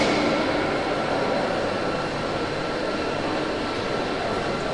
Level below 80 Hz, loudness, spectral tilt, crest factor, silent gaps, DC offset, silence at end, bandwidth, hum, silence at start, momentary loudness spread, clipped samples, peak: -46 dBFS; -25 LUFS; -5 dB/octave; 18 dB; none; under 0.1%; 0 s; 11.5 kHz; none; 0 s; 4 LU; under 0.1%; -8 dBFS